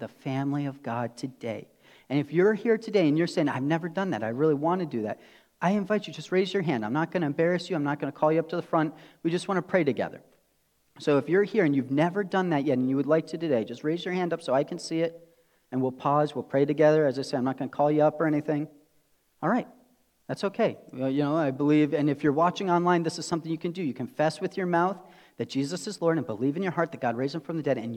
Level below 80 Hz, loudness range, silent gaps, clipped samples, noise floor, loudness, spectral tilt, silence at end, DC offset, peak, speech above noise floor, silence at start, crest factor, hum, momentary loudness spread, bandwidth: -76 dBFS; 3 LU; none; under 0.1%; -69 dBFS; -27 LUFS; -7 dB/octave; 0 s; under 0.1%; -8 dBFS; 43 dB; 0 s; 18 dB; none; 9 LU; 11.5 kHz